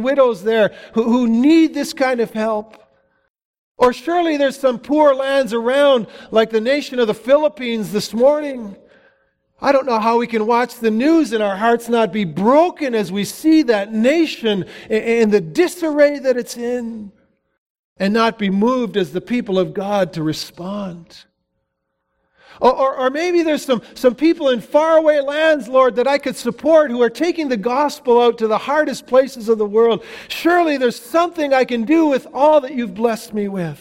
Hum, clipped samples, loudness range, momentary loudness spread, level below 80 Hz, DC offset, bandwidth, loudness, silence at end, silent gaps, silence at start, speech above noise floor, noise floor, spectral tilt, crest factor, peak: none; under 0.1%; 5 LU; 8 LU; -56 dBFS; under 0.1%; 16.5 kHz; -17 LUFS; 0.05 s; 3.30-3.35 s, 3.45-3.75 s, 17.58-17.96 s; 0 s; 57 dB; -73 dBFS; -5.5 dB/octave; 16 dB; 0 dBFS